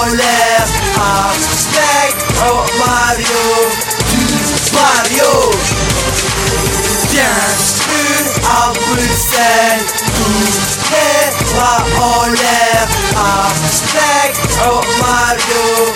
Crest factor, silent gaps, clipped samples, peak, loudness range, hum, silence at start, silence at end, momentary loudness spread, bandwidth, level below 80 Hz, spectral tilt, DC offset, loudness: 12 dB; none; under 0.1%; 0 dBFS; 0 LU; none; 0 s; 0 s; 3 LU; 18 kHz; -28 dBFS; -2.5 dB/octave; under 0.1%; -11 LUFS